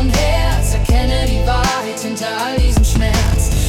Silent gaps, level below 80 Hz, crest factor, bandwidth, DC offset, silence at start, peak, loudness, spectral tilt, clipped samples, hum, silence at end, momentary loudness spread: none; -16 dBFS; 10 dB; 16.5 kHz; under 0.1%; 0 s; -4 dBFS; -16 LUFS; -5 dB/octave; under 0.1%; none; 0 s; 6 LU